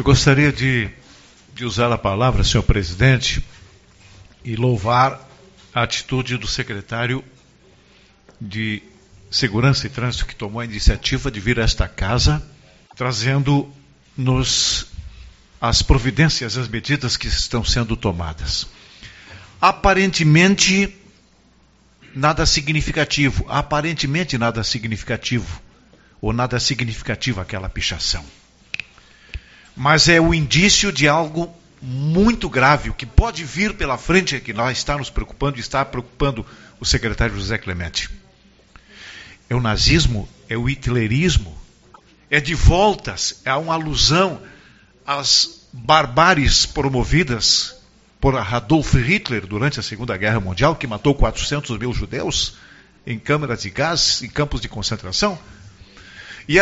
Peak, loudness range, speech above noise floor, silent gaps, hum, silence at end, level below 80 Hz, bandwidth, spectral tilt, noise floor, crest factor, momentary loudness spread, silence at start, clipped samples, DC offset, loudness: 0 dBFS; 7 LU; 36 dB; none; none; 0 s; -28 dBFS; 8 kHz; -3.5 dB/octave; -54 dBFS; 20 dB; 14 LU; 0 s; under 0.1%; under 0.1%; -18 LUFS